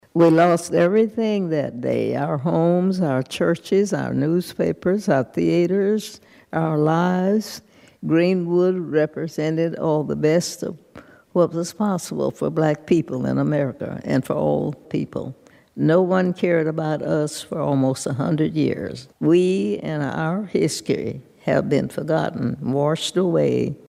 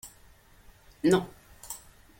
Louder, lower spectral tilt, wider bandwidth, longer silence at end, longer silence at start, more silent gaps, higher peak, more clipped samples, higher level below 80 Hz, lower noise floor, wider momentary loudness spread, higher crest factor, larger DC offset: first, -21 LUFS vs -27 LUFS; about the same, -6.5 dB/octave vs -5.5 dB/octave; about the same, 15 kHz vs 16.5 kHz; second, 0.1 s vs 0.45 s; about the same, 0.15 s vs 0.05 s; neither; first, -4 dBFS vs -10 dBFS; neither; about the same, -58 dBFS vs -58 dBFS; second, -46 dBFS vs -57 dBFS; second, 8 LU vs 23 LU; second, 16 dB vs 22 dB; neither